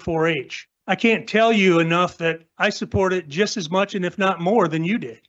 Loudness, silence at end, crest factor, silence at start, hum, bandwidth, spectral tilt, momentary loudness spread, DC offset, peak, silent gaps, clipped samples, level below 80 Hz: -20 LUFS; 0.15 s; 14 dB; 0 s; none; 8 kHz; -5.5 dB/octave; 8 LU; under 0.1%; -6 dBFS; none; under 0.1%; -52 dBFS